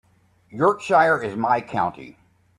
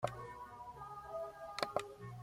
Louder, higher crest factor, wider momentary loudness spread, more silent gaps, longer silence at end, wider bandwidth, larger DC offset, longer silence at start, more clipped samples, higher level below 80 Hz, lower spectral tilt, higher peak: first, -21 LUFS vs -45 LUFS; second, 18 dB vs 28 dB; about the same, 9 LU vs 10 LU; neither; first, 0.45 s vs 0 s; second, 11.5 kHz vs 16.5 kHz; neither; first, 0.55 s vs 0 s; neither; first, -60 dBFS vs -68 dBFS; first, -6 dB/octave vs -4.5 dB/octave; first, -4 dBFS vs -18 dBFS